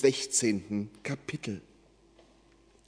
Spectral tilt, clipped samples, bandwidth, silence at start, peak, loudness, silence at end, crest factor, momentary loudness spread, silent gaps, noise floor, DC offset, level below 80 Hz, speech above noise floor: -3.5 dB/octave; under 0.1%; 11 kHz; 0 s; -10 dBFS; -31 LUFS; 1.3 s; 22 dB; 12 LU; none; -62 dBFS; under 0.1%; -68 dBFS; 31 dB